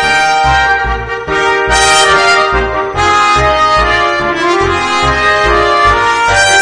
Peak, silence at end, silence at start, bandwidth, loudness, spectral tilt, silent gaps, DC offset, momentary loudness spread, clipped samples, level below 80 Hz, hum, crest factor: 0 dBFS; 0 s; 0 s; 11 kHz; -9 LUFS; -2.5 dB/octave; none; under 0.1%; 6 LU; 0.2%; -24 dBFS; none; 10 dB